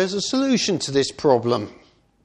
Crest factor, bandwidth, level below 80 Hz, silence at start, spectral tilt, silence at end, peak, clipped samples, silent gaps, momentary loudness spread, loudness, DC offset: 18 dB; 10.5 kHz; -58 dBFS; 0 s; -4.5 dB/octave; 0.5 s; -2 dBFS; under 0.1%; none; 6 LU; -21 LUFS; under 0.1%